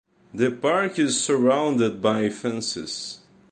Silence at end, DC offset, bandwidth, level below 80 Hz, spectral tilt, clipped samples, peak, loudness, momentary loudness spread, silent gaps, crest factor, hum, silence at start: 0.35 s; under 0.1%; 10.5 kHz; -64 dBFS; -4 dB/octave; under 0.1%; -6 dBFS; -23 LUFS; 12 LU; none; 16 dB; none; 0.35 s